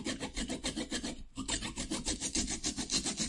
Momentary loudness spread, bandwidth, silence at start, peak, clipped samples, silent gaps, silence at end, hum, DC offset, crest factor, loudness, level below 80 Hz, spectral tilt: 6 LU; 11.5 kHz; 0 s; -18 dBFS; under 0.1%; none; 0 s; none; under 0.1%; 20 dB; -36 LUFS; -48 dBFS; -2 dB/octave